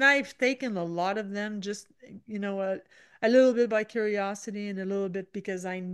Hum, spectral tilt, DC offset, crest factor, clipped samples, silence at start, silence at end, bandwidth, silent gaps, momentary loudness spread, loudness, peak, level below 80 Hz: none; -5 dB/octave; under 0.1%; 18 dB; under 0.1%; 0 s; 0 s; 12 kHz; none; 14 LU; -29 LUFS; -10 dBFS; -78 dBFS